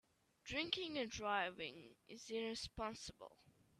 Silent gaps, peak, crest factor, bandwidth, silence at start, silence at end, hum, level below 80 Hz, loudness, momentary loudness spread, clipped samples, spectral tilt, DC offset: none; -22 dBFS; 26 dB; 13.5 kHz; 0.45 s; 0.3 s; none; -68 dBFS; -44 LUFS; 18 LU; under 0.1%; -3 dB/octave; under 0.1%